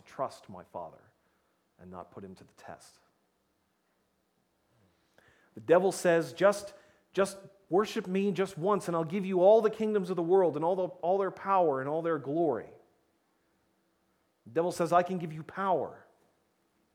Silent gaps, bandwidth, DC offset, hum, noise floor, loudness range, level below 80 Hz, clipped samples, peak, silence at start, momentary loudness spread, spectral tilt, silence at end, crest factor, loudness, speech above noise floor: none; 16 kHz; under 0.1%; none; -75 dBFS; 7 LU; -76 dBFS; under 0.1%; -10 dBFS; 0.2 s; 22 LU; -6 dB/octave; 0.95 s; 22 dB; -29 LUFS; 46 dB